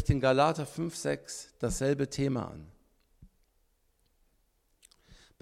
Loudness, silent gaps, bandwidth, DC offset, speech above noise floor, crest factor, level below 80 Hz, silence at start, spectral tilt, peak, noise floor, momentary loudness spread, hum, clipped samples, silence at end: -31 LUFS; none; 15 kHz; under 0.1%; 42 dB; 22 dB; -48 dBFS; 0 s; -5.5 dB/octave; -10 dBFS; -72 dBFS; 14 LU; none; under 0.1%; 0.25 s